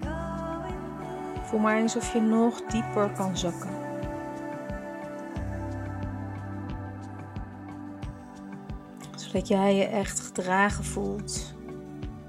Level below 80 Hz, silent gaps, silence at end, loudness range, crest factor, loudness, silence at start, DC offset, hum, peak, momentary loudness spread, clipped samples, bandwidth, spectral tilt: -44 dBFS; none; 0 s; 10 LU; 22 dB; -30 LUFS; 0 s; under 0.1%; none; -8 dBFS; 16 LU; under 0.1%; 14.5 kHz; -5 dB/octave